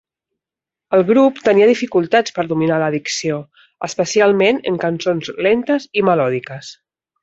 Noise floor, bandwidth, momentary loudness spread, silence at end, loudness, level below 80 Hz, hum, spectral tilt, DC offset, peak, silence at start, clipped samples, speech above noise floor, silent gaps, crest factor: -87 dBFS; 8 kHz; 12 LU; 0.5 s; -16 LUFS; -60 dBFS; none; -5 dB/octave; under 0.1%; -2 dBFS; 0.9 s; under 0.1%; 71 dB; none; 14 dB